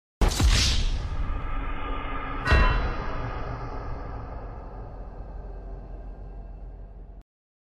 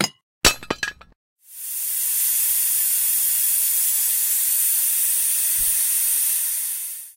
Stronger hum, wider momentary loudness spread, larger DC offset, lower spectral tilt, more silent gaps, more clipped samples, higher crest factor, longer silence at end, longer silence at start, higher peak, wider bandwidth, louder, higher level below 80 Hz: neither; first, 21 LU vs 9 LU; neither; first, -4 dB/octave vs 0.5 dB/octave; second, none vs 0.23-0.41 s, 1.15-1.36 s; neither; about the same, 18 dB vs 20 dB; first, 0.6 s vs 0.05 s; first, 0.2 s vs 0 s; second, -10 dBFS vs 0 dBFS; second, 14.5 kHz vs 16 kHz; second, -28 LUFS vs -18 LUFS; first, -30 dBFS vs -46 dBFS